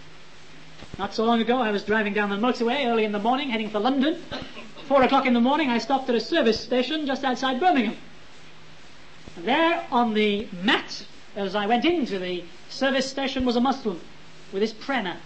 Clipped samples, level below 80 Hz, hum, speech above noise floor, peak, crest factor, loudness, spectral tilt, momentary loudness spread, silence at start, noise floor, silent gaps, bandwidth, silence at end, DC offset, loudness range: under 0.1%; -54 dBFS; none; 26 dB; -8 dBFS; 16 dB; -24 LUFS; -5 dB/octave; 13 LU; 0.05 s; -49 dBFS; none; 8.6 kHz; 0 s; 0.9%; 3 LU